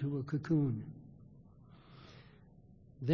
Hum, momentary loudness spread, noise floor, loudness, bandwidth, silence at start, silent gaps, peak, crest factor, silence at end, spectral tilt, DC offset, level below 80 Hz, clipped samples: none; 27 LU; -60 dBFS; -36 LUFS; 6.6 kHz; 0 s; none; -18 dBFS; 20 dB; 0 s; -9 dB/octave; under 0.1%; -66 dBFS; under 0.1%